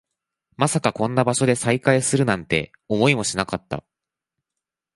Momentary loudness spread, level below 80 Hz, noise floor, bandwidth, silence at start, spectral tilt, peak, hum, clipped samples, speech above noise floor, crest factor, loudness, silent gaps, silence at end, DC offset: 8 LU; -52 dBFS; -87 dBFS; 11.5 kHz; 0.6 s; -4.5 dB/octave; -2 dBFS; none; under 0.1%; 66 dB; 22 dB; -21 LUFS; none; 1.15 s; under 0.1%